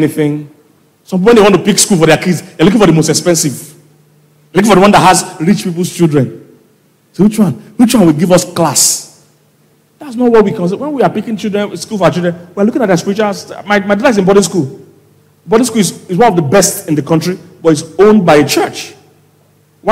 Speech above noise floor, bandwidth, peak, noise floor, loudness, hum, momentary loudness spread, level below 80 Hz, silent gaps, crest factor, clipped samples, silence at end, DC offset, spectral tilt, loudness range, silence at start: 41 dB; 16.5 kHz; 0 dBFS; -50 dBFS; -10 LUFS; none; 11 LU; -42 dBFS; none; 10 dB; under 0.1%; 0 s; under 0.1%; -4.5 dB/octave; 4 LU; 0 s